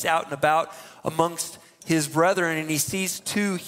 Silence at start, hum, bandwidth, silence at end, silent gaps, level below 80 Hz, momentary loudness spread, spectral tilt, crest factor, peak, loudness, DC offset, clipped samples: 0 s; none; 16 kHz; 0 s; none; -64 dBFS; 11 LU; -3.5 dB/octave; 20 dB; -4 dBFS; -24 LUFS; under 0.1%; under 0.1%